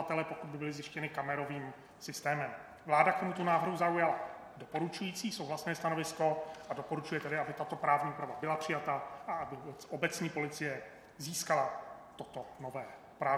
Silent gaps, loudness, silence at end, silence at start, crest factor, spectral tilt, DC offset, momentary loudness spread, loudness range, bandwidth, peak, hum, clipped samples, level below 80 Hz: none; -36 LUFS; 0 s; 0 s; 26 dB; -4.5 dB/octave; under 0.1%; 14 LU; 5 LU; 19 kHz; -12 dBFS; none; under 0.1%; -74 dBFS